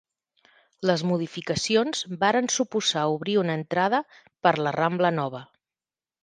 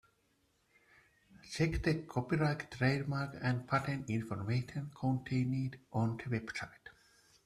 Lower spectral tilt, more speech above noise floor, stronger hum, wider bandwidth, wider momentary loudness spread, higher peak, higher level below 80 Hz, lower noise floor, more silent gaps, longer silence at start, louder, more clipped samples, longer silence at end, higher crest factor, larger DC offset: second, -4 dB/octave vs -7 dB/octave; first, over 65 dB vs 40 dB; neither; second, 10 kHz vs 13 kHz; about the same, 6 LU vs 8 LU; first, -6 dBFS vs -18 dBFS; second, -66 dBFS vs -56 dBFS; first, under -90 dBFS vs -75 dBFS; neither; second, 0.8 s vs 1.35 s; first, -25 LUFS vs -36 LUFS; neither; first, 0.8 s vs 0.55 s; about the same, 20 dB vs 20 dB; neither